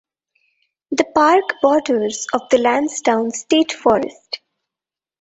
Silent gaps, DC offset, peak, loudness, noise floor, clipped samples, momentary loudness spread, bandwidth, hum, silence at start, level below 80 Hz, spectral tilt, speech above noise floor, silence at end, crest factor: none; under 0.1%; 0 dBFS; -17 LUFS; -89 dBFS; under 0.1%; 11 LU; 8.2 kHz; none; 0.9 s; -58 dBFS; -3 dB/octave; 72 dB; 0.85 s; 18 dB